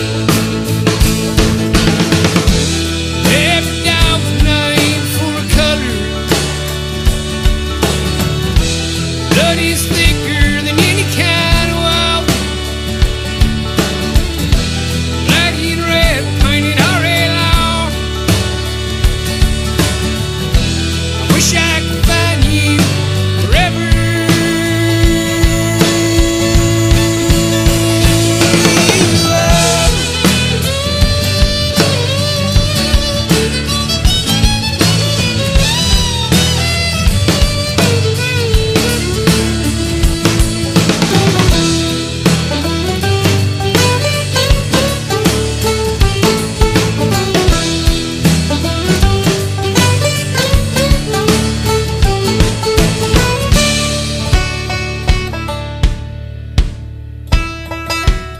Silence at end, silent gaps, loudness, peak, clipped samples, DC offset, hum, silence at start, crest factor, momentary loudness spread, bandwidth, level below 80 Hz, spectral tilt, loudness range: 0 s; none; -12 LUFS; 0 dBFS; under 0.1%; under 0.1%; none; 0 s; 12 dB; 5 LU; 16 kHz; -18 dBFS; -4.5 dB/octave; 4 LU